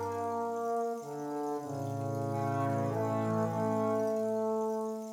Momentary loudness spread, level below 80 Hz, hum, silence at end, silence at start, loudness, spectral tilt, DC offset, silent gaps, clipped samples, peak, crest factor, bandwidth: 6 LU; -78 dBFS; none; 0 s; 0 s; -34 LUFS; -7.5 dB/octave; under 0.1%; none; under 0.1%; -20 dBFS; 14 dB; 19 kHz